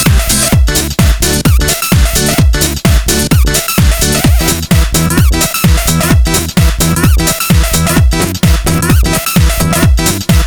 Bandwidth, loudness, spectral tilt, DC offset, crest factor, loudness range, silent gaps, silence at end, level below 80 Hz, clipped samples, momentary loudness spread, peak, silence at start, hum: over 20 kHz; -9 LUFS; -4 dB/octave; under 0.1%; 8 dB; 0 LU; none; 0 s; -12 dBFS; under 0.1%; 2 LU; 0 dBFS; 0 s; none